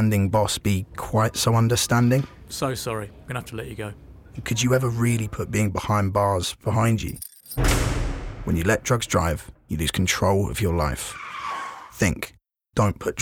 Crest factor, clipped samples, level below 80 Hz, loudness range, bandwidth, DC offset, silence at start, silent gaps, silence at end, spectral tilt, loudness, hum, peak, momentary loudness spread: 14 dB; under 0.1%; -36 dBFS; 2 LU; 17.5 kHz; under 0.1%; 0 s; none; 0 s; -5 dB/octave; -24 LUFS; none; -8 dBFS; 12 LU